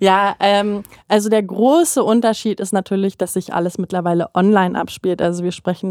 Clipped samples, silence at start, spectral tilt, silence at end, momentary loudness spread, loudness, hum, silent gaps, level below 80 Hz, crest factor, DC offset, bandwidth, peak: under 0.1%; 0 s; -5 dB/octave; 0 s; 8 LU; -17 LUFS; none; none; -58 dBFS; 16 dB; under 0.1%; 16.5 kHz; 0 dBFS